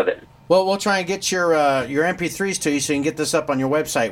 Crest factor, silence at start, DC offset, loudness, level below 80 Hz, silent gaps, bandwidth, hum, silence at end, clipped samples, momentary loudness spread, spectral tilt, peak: 16 dB; 0 s; under 0.1%; -20 LUFS; -54 dBFS; none; 16.5 kHz; none; 0 s; under 0.1%; 5 LU; -3.5 dB/octave; -4 dBFS